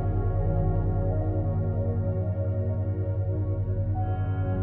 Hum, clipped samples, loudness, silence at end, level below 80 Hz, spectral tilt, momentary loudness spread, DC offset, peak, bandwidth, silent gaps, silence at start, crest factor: none; under 0.1%; -28 LUFS; 0 s; -34 dBFS; -11.5 dB/octave; 2 LU; under 0.1%; -14 dBFS; 2.4 kHz; none; 0 s; 12 dB